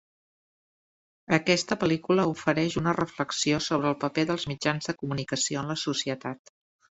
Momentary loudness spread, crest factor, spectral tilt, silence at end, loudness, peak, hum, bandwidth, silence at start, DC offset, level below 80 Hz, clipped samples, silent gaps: 7 LU; 24 dB; -4.5 dB/octave; 0.55 s; -27 LUFS; -4 dBFS; none; 8.2 kHz; 1.3 s; under 0.1%; -60 dBFS; under 0.1%; none